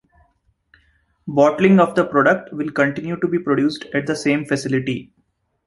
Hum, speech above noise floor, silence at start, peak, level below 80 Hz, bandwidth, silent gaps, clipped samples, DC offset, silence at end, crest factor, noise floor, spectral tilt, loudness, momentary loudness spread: none; 49 dB; 1.25 s; -2 dBFS; -58 dBFS; 11.5 kHz; none; under 0.1%; under 0.1%; 0.6 s; 18 dB; -66 dBFS; -6.5 dB/octave; -18 LUFS; 10 LU